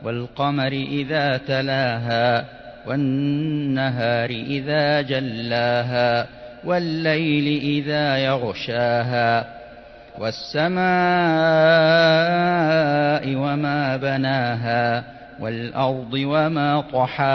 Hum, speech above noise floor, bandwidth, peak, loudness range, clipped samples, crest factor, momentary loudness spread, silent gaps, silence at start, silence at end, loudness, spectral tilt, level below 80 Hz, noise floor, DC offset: none; 22 dB; 6.2 kHz; -6 dBFS; 5 LU; under 0.1%; 14 dB; 9 LU; none; 0 s; 0 s; -20 LUFS; -7.5 dB/octave; -54 dBFS; -42 dBFS; under 0.1%